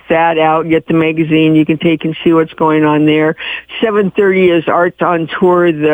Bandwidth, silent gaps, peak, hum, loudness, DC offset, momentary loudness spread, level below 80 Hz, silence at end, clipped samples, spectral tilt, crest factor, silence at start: 3.8 kHz; none; 0 dBFS; none; -11 LUFS; under 0.1%; 4 LU; -50 dBFS; 0 s; under 0.1%; -8.5 dB/octave; 10 dB; 0.1 s